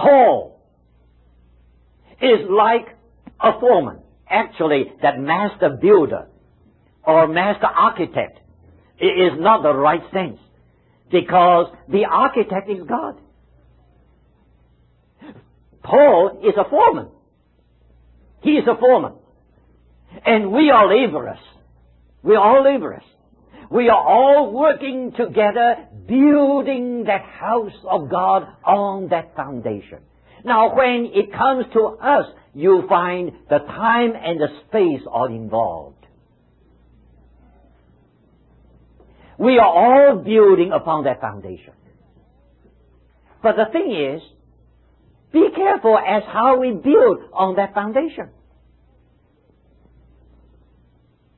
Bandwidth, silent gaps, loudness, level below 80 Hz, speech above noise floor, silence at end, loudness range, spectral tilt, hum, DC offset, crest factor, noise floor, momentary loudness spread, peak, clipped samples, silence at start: 4.2 kHz; none; -16 LUFS; -54 dBFS; 42 dB; 3.15 s; 8 LU; -10.5 dB/octave; none; under 0.1%; 16 dB; -58 dBFS; 13 LU; -2 dBFS; under 0.1%; 0 s